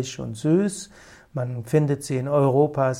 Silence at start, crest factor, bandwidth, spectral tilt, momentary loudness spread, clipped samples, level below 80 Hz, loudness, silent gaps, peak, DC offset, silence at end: 0 s; 16 dB; 15 kHz; -7 dB/octave; 14 LU; under 0.1%; -58 dBFS; -23 LUFS; none; -6 dBFS; under 0.1%; 0 s